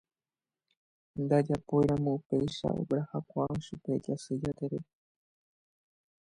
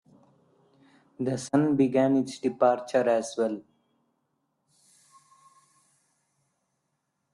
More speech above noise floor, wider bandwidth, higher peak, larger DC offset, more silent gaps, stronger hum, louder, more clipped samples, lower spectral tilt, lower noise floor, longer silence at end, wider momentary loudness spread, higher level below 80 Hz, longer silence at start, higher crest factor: first, over 59 dB vs 54 dB; about the same, 10.5 kHz vs 11.5 kHz; second, -14 dBFS vs -10 dBFS; neither; first, 2.26-2.30 s vs none; neither; second, -32 LUFS vs -26 LUFS; neither; first, -8 dB/octave vs -6.5 dB/octave; first, under -90 dBFS vs -79 dBFS; second, 1.5 s vs 3.75 s; about the same, 10 LU vs 9 LU; first, -60 dBFS vs -72 dBFS; about the same, 1.15 s vs 1.2 s; about the same, 20 dB vs 20 dB